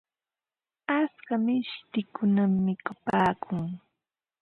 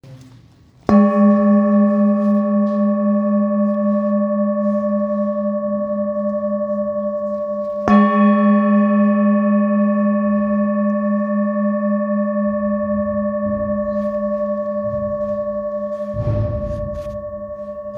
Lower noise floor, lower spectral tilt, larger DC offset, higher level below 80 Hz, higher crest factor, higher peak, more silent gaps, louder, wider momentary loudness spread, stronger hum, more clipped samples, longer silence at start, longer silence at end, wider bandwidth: first, under -90 dBFS vs -48 dBFS; second, -8.5 dB/octave vs -10.5 dB/octave; neither; second, -64 dBFS vs -42 dBFS; about the same, 18 dB vs 18 dB; second, -10 dBFS vs 0 dBFS; neither; second, -28 LUFS vs -18 LUFS; about the same, 9 LU vs 10 LU; neither; neither; first, 0.9 s vs 0.05 s; first, 0.65 s vs 0 s; first, 5 kHz vs 3.5 kHz